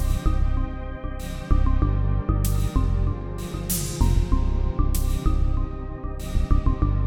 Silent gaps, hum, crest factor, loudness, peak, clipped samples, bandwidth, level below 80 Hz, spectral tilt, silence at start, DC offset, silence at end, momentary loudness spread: none; none; 16 dB; -26 LUFS; -6 dBFS; under 0.1%; 17.5 kHz; -24 dBFS; -6 dB/octave; 0 s; under 0.1%; 0 s; 10 LU